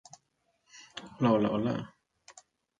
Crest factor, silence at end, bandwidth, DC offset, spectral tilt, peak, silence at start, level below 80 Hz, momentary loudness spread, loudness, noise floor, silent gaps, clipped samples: 20 dB; 0.5 s; 9.2 kHz; under 0.1%; -7 dB/octave; -14 dBFS; 0.75 s; -66 dBFS; 20 LU; -29 LUFS; -76 dBFS; none; under 0.1%